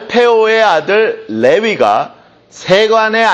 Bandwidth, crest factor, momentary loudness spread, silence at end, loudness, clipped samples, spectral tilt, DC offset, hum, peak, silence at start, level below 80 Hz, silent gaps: 8.4 kHz; 10 dB; 7 LU; 0 s; -11 LUFS; under 0.1%; -4 dB/octave; under 0.1%; none; 0 dBFS; 0 s; -56 dBFS; none